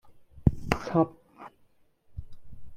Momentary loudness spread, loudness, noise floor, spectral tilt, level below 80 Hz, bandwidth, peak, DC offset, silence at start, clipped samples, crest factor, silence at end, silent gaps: 23 LU; -28 LUFS; -63 dBFS; -7.5 dB/octave; -42 dBFS; 16 kHz; -4 dBFS; under 0.1%; 0.05 s; under 0.1%; 28 dB; 0 s; none